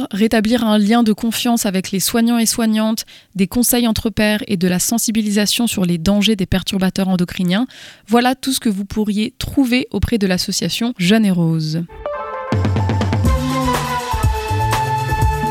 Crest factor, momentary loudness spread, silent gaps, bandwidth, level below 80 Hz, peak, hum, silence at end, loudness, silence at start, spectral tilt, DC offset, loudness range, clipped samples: 14 dB; 6 LU; none; 17.5 kHz; -30 dBFS; -2 dBFS; none; 0 s; -17 LUFS; 0 s; -4.5 dB/octave; under 0.1%; 2 LU; under 0.1%